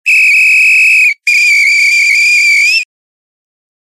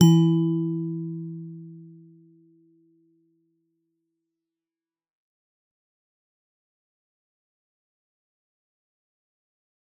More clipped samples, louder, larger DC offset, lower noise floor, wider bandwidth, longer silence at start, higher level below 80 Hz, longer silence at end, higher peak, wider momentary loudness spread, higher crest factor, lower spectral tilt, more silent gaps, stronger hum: neither; first, -5 LUFS vs -24 LUFS; neither; about the same, under -90 dBFS vs under -90 dBFS; first, 16 kHz vs 7.4 kHz; about the same, 0.05 s vs 0 s; second, under -90 dBFS vs -76 dBFS; second, 0.95 s vs 8.15 s; about the same, -2 dBFS vs -4 dBFS; second, 4 LU vs 24 LU; second, 8 dB vs 26 dB; second, 16 dB/octave vs -9 dB/octave; neither; neither